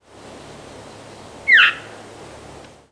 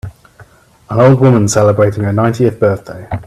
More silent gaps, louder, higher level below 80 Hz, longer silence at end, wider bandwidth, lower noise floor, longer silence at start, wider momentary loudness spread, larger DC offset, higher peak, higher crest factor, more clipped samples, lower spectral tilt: neither; about the same, -13 LUFS vs -11 LUFS; second, -56 dBFS vs -42 dBFS; first, 1.1 s vs 0.05 s; second, 11 kHz vs 13.5 kHz; about the same, -41 dBFS vs -42 dBFS; first, 1.45 s vs 0.05 s; first, 28 LU vs 13 LU; neither; about the same, -2 dBFS vs 0 dBFS; first, 20 dB vs 12 dB; neither; second, -1.5 dB/octave vs -7 dB/octave